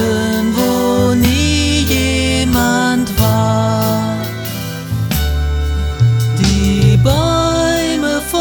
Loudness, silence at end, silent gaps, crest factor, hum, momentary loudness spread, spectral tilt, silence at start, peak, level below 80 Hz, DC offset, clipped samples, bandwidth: -14 LUFS; 0 s; none; 12 dB; none; 7 LU; -5.5 dB/octave; 0 s; 0 dBFS; -22 dBFS; under 0.1%; under 0.1%; over 20 kHz